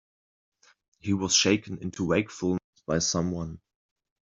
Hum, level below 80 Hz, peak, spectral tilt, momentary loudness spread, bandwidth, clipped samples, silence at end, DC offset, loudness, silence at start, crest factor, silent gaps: none; -58 dBFS; -8 dBFS; -3.5 dB/octave; 14 LU; 8.2 kHz; under 0.1%; 0.75 s; under 0.1%; -27 LUFS; 1.05 s; 20 dB; 2.64-2.73 s